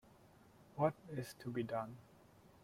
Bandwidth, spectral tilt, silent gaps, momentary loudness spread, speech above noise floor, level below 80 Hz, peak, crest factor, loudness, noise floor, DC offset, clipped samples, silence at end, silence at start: 16.5 kHz; -7 dB/octave; none; 15 LU; 24 dB; -76 dBFS; -22 dBFS; 22 dB; -42 LUFS; -65 dBFS; under 0.1%; under 0.1%; 0.15 s; 0.2 s